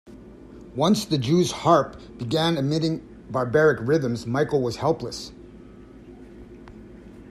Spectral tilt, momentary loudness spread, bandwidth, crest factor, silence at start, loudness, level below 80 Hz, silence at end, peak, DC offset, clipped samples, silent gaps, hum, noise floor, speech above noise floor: -6 dB/octave; 25 LU; 14 kHz; 20 dB; 0.05 s; -23 LUFS; -52 dBFS; 0 s; -6 dBFS; under 0.1%; under 0.1%; none; none; -45 dBFS; 23 dB